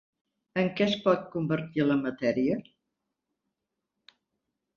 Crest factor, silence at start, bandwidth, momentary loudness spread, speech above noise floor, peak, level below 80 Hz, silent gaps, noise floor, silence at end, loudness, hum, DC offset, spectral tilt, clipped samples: 20 dB; 0.55 s; 7 kHz; 4 LU; 57 dB; -10 dBFS; -68 dBFS; none; -85 dBFS; 2.15 s; -28 LUFS; none; under 0.1%; -7 dB/octave; under 0.1%